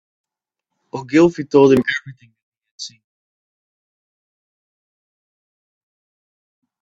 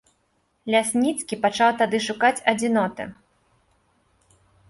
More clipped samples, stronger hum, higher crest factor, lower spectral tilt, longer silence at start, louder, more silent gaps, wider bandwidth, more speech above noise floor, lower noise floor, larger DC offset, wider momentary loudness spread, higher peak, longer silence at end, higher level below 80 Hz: neither; neither; about the same, 22 dB vs 20 dB; first, -6 dB/octave vs -3.5 dB/octave; first, 0.95 s vs 0.65 s; first, -15 LUFS vs -22 LUFS; first, 2.42-2.52 s, 2.71-2.78 s vs none; second, 8 kHz vs 11.5 kHz; first, 67 dB vs 47 dB; first, -82 dBFS vs -68 dBFS; neither; first, 21 LU vs 11 LU; first, 0 dBFS vs -4 dBFS; first, 3.95 s vs 1.55 s; about the same, -60 dBFS vs -64 dBFS